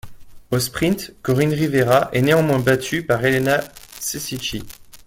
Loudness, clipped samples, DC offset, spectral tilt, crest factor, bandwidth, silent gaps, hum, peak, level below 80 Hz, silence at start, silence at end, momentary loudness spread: -19 LUFS; under 0.1%; under 0.1%; -5 dB/octave; 18 dB; 17 kHz; none; none; -2 dBFS; -46 dBFS; 0.05 s; 0.1 s; 11 LU